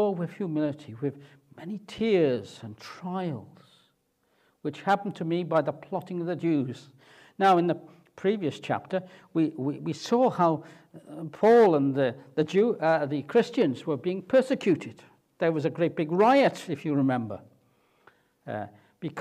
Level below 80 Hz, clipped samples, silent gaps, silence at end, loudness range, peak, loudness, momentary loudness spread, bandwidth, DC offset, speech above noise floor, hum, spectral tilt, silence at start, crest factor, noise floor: -72 dBFS; under 0.1%; none; 0 s; 7 LU; -10 dBFS; -27 LUFS; 16 LU; 13 kHz; under 0.1%; 45 dB; none; -7 dB/octave; 0 s; 18 dB; -71 dBFS